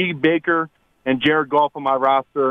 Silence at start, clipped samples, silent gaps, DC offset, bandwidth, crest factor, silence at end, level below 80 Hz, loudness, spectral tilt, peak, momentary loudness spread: 0 s; under 0.1%; none; under 0.1%; 5.4 kHz; 14 dB; 0 s; -60 dBFS; -19 LUFS; -7.5 dB/octave; -6 dBFS; 6 LU